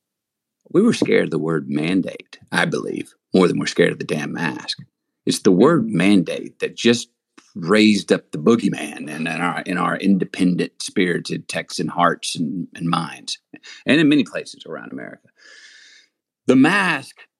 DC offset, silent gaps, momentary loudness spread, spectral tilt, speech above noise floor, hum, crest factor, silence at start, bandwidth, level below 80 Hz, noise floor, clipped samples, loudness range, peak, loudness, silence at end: under 0.1%; none; 15 LU; -5 dB/octave; 63 dB; none; 20 dB; 0.75 s; 12.5 kHz; -66 dBFS; -82 dBFS; under 0.1%; 4 LU; 0 dBFS; -19 LUFS; 0.15 s